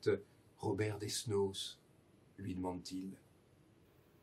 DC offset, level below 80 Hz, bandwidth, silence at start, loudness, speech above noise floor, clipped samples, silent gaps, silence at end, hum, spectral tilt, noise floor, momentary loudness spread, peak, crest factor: under 0.1%; -78 dBFS; 15.5 kHz; 0 s; -41 LUFS; 28 dB; under 0.1%; none; 1.05 s; none; -5 dB/octave; -68 dBFS; 15 LU; -22 dBFS; 20 dB